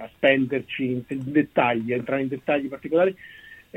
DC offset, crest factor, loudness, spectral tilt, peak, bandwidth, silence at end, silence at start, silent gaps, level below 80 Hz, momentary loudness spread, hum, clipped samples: under 0.1%; 18 dB; -24 LUFS; -7.5 dB/octave; -6 dBFS; 15 kHz; 0.2 s; 0 s; none; -62 dBFS; 7 LU; none; under 0.1%